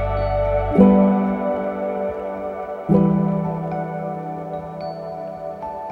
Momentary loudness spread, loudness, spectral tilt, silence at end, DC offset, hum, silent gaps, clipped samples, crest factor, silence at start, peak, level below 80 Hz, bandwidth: 16 LU; -21 LUFS; -10.5 dB/octave; 0 s; under 0.1%; none; none; under 0.1%; 18 dB; 0 s; -2 dBFS; -36 dBFS; 4.7 kHz